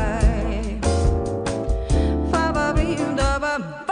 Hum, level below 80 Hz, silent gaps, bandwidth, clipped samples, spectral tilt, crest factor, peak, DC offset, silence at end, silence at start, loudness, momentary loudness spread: none; -24 dBFS; none; 10.5 kHz; under 0.1%; -6 dB/octave; 16 dB; -6 dBFS; under 0.1%; 0 s; 0 s; -22 LUFS; 5 LU